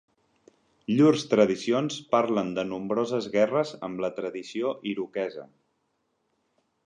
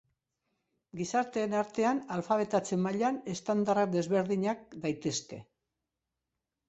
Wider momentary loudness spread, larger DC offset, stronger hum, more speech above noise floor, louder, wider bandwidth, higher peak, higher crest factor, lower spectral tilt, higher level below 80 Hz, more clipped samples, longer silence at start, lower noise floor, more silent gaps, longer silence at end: first, 12 LU vs 8 LU; neither; neither; second, 49 dB vs 57 dB; first, -26 LUFS vs -31 LUFS; first, 10 kHz vs 8.2 kHz; first, -6 dBFS vs -14 dBFS; about the same, 20 dB vs 18 dB; about the same, -6 dB/octave vs -5.5 dB/octave; about the same, -70 dBFS vs -72 dBFS; neither; about the same, 0.9 s vs 0.95 s; second, -75 dBFS vs -88 dBFS; neither; first, 1.4 s vs 1.25 s